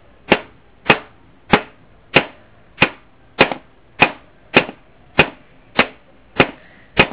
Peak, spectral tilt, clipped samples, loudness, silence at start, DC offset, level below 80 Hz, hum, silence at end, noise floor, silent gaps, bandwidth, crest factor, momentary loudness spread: 0 dBFS; -8.5 dB/octave; 0.2%; -17 LUFS; 0.3 s; 0.3%; -44 dBFS; none; 0 s; -46 dBFS; none; 4 kHz; 20 dB; 9 LU